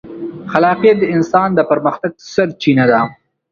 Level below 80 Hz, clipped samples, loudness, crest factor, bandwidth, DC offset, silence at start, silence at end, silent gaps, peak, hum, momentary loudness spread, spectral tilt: -52 dBFS; under 0.1%; -14 LUFS; 14 dB; 7.2 kHz; under 0.1%; 0.05 s; 0.4 s; none; 0 dBFS; none; 11 LU; -7 dB/octave